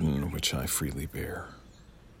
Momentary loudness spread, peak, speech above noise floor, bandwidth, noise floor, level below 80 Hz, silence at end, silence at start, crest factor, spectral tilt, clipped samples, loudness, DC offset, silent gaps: 15 LU; -14 dBFS; 20 dB; 16.5 kHz; -53 dBFS; -44 dBFS; 0 s; 0 s; 18 dB; -4 dB/octave; under 0.1%; -32 LUFS; under 0.1%; none